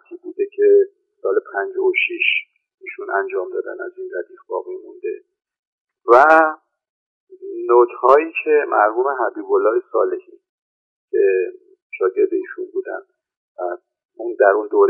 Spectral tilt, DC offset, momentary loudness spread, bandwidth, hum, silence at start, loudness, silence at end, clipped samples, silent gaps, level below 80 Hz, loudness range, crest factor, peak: 0.5 dB/octave; under 0.1%; 17 LU; 6 kHz; none; 0.1 s; -18 LUFS; 0 s; under 0.1%; 2.74-2.78 s, 5.59-5.85 s, 6.89-7.27 s, 10.49-11.08 s, 11.82-11.90 s, 13.37-13.55 s, 14.05-14.09 s; -70 dBFS; 7 LU; 18 dB; 0 dBFS